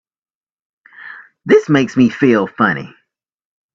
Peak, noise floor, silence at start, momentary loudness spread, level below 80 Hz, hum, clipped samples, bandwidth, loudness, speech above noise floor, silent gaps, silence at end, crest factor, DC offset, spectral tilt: 0 dBFS; -37 dBFS; 1 s; 22 LU; -56 dBFS; none; under 0.1%; 7.6 kHz; -14 LUFS; 24 dB; none; 0.9 s; 16 dB; under 0.1%; -7 dB/octave